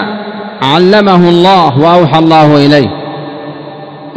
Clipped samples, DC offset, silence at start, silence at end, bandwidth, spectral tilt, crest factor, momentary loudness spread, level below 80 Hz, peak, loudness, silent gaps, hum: 6%; under 0.1%; 0 s; 0 s; 8 kHz; -7 dB/octave; 8 dB; 18 LU; -46 dBFS; 0 dBFS; -6 LUFS; none; none